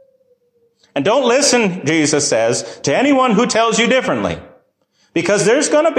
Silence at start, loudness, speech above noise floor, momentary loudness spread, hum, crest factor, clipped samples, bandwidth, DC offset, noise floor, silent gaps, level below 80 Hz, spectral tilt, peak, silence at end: 0.95 s; -14 LUFS; 46 dB; 8 LU; none; 12 dB; under 0.1%; 14 kHz; under 0.1%; -60 dBFS; none; -52 dBFS; -3.5 dB/octave; -2 dBFS; 0 s